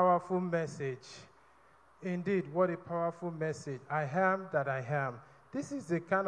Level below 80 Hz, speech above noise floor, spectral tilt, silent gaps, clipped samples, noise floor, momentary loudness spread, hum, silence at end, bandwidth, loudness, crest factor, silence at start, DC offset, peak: -76 dBFS; 30 dB; -7 dB/octave; none; under 0.1%; -64 dBFS; 12 LU; none; 0 s; 10.5 kHz; -35 LUFS; 18 dB; 0 s; under 0.1%; -16 dBFS